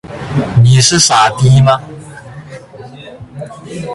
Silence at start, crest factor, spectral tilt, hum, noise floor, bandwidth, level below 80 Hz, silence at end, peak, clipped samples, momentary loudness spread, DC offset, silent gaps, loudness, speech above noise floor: 0.05 s; 12 dB; -4 dB/octave; none; -32 dBFS; 11.5 kHz; -38 dBFS; 0 s; 0 dBFS; under 0.1%; 24 LU; under 0.1%; none; -9 LUFS; 24 dB